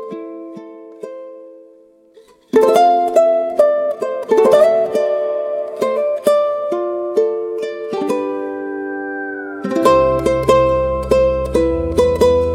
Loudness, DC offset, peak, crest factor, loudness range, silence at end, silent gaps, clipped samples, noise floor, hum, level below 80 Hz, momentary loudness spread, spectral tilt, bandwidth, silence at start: -16 LUFS; under 0.1%; 0 dBFS; 16 dB; 5 LU; 0 s; none; under 0.1%; -47 dBFS; none; -36 dBFS; 17 LU; -6 dB/octave; 16 kHz; 0 s